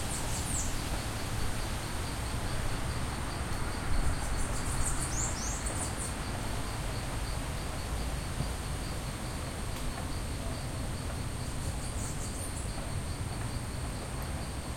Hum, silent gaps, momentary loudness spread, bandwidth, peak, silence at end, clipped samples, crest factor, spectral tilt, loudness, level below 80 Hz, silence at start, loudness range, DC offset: none; none; 5 LU; 16.5 kHz; -16 dBFS; 0 s; under 0.1%; 16 dB; -4 dB/octave; -36 LUFS; -38 dBFS; 0 s; 3 LU; under 0.1%